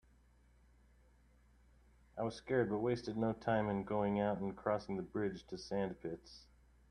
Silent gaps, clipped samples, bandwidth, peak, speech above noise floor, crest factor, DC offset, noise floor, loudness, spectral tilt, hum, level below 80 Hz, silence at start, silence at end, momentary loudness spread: none; under 0.1%; 9.8 kHz; -20 dBFS; 30 dB; 20 dB; under 0.1%; -68 dBFS; -39 LUFS; -7.5 dB/octave; none; -66 dBFS; 2.15 s; 0.5 s; 12 LU